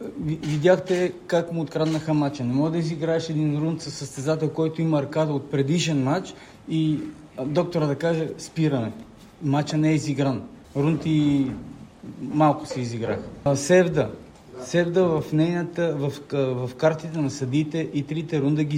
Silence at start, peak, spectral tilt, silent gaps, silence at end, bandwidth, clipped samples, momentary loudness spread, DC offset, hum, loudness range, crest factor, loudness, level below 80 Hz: 0 s; -6 dBFS; -6.5 dB/octave; none; 0 s; 11 kHz; under 0.1%; 10 LU; under 0.1%; none; 2 LU; 18 dB; -24 LUFS; -56 dBFS